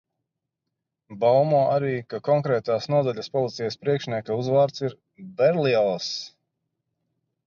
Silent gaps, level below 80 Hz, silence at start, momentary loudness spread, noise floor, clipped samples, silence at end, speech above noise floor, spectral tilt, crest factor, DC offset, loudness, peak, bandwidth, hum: none; -70 dBFS; 1.1 s; 10 LU; -83 dBFS; under 0.1%; 1.2 s; 60 dB; -6.5 dB/octave; 16 dB; under 0.1%; -23 LUFS; -8 dBFS; 7.2 kHz; none